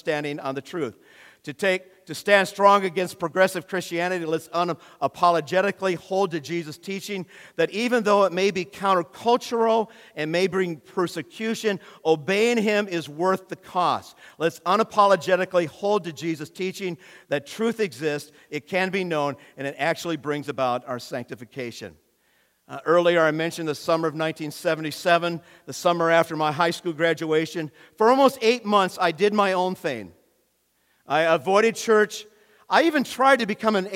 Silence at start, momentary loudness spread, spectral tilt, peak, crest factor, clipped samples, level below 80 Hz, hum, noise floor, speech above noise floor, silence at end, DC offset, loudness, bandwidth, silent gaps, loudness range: 0.05 s; 13 LU; -4.5 dB/octave; -4 dBFS; 20 dB; under 0.1%; -72 dBFS; none; -68 dBFS; 45 dB; 0 s; under 0.1%; -23 LUFS; 16.5 kHz; none; 5 LU